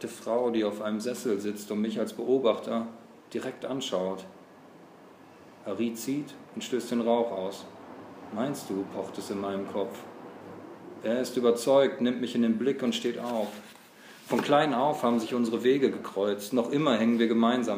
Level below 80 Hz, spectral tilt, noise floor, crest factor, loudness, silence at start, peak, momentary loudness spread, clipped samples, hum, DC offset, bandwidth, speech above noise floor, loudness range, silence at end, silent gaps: -80 dBFS; -5 dB/octave; -52 dBFS; 18 dB; -29 LUFS; 0 s; -10 dBFS; 19 LU; under 0.1%; none; under 0.1%; 15.5 kHz; 24 dB; 8 LU; 0 s; none